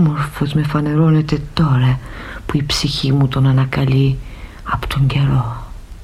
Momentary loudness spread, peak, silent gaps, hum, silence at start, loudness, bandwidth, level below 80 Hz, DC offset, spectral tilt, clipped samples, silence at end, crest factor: 13 LU; -2 dBFS; none; none; 0 s; -16 LUFS; 13 kHz; -32 dBFS; under 0.1%; -6.5 dB/octave; under 0.1%; 0 s; 14 dB